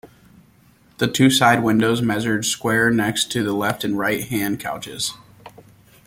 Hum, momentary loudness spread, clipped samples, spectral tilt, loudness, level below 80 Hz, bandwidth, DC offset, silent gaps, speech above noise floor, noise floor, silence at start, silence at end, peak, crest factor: none; 10 LU; under 0.1%; -4 dB/octave; -19 LUFS; -54 dBFS; 17 kHz; under 0.1%; none; 34 dB; -54 dBFS; 0.05 s; 0.55 s; -2 dBFS; 20 dB